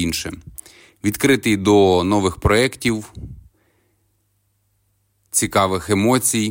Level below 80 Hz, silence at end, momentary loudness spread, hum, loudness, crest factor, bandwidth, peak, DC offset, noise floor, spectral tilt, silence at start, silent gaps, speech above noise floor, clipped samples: -40 dBFS; 0 s; 22 LU; none; -17 LUFS; 16 dB; 16.5 kHz; -4 dBFS; under 0.1%; -66 dBFS; -4.5 dB/octave; 0 s; none; 48 dB; under 0.1%